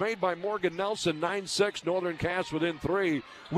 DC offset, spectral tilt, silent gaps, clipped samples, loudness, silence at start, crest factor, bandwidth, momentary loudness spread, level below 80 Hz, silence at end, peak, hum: under 0.1%; -4.5 dB/octave; none; under 0.1%; -30 LUFS; 0 s; 18 dB; 14 kHz; 3 LU; -58 dBFS; 0 s; -12 dBFS; none